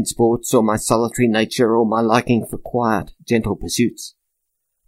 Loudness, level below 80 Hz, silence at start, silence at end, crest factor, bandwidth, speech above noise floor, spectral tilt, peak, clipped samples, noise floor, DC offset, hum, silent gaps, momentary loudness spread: -18 LUFS; -42 dBFS; 0 s; 0.8 s; 18 dB; 16 kHz; 57 dB; -5 dB/octave; 0 dBFS; under 0.1%; -75 dBFS; under 0.1%; none; none; 6 LU